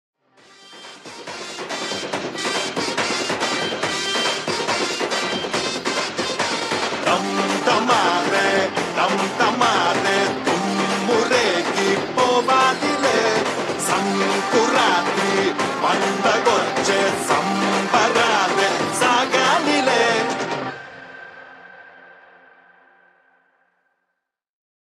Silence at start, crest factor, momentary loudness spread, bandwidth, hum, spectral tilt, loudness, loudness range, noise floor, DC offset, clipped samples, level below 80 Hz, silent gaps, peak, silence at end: 0.65 s; 18 dB; 9 LU; 14.5 kHz; none; -3 dB/octave; -19 LUFS; 5 LU; -78 dBFS; under 0.1%; under 0.1%; -62 dBFS; none; -2 dBFS; 2.9 s